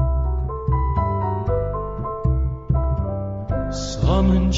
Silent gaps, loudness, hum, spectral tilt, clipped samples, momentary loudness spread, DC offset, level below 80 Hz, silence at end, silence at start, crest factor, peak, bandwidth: none; -23 LUFS; none; -7.5 dB/octave; under 0.1%; 8 LU; under 0.1%; -24 dBFS; 0 s; 0 s; 14 dB; -6 dBFS; 7.8 kHz